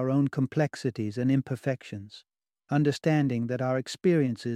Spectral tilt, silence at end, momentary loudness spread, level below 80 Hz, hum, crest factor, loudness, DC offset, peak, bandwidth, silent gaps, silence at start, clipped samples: -7.5 dB/octave; 0 s; 8 LU; -68 dBFS; none; 16 dB; -28 LUFS; under 0.1%; -12 dBFS; 12.5 kHz; none; 0 s; under 0.1%